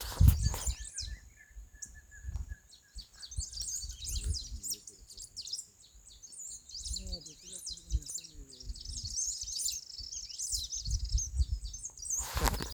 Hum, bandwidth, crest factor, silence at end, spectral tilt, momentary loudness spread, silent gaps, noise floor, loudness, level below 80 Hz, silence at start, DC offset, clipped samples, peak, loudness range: none; over 20 kHz; 28 dB; 0 s; -3 dB/octave; 17 LU; none; -57 dBFS; -36 LUFS; -40 dBFS; 0 s; under 0.1%; under 0.1%; -8 dBFS; 7 LU